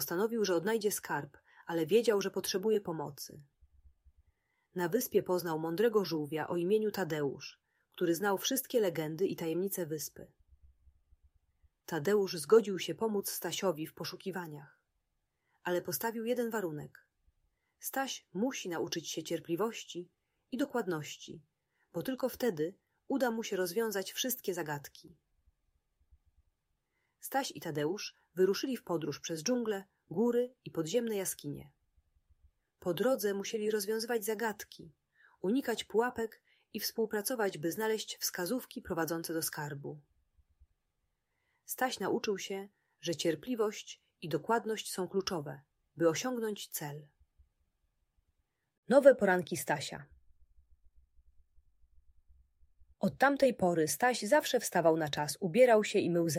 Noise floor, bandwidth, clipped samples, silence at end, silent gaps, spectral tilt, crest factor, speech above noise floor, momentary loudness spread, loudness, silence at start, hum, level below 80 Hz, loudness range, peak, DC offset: -83 dBFS; 16 kHz; under 0.1%; 0 s; 48.78-48.83 s; -4 dB/octave; 26 dB; 49 dB; 14 LU; -34 LUFS; 0 s; none; -72 dBFS; 7 LU; -10 dBFS; under 0.1%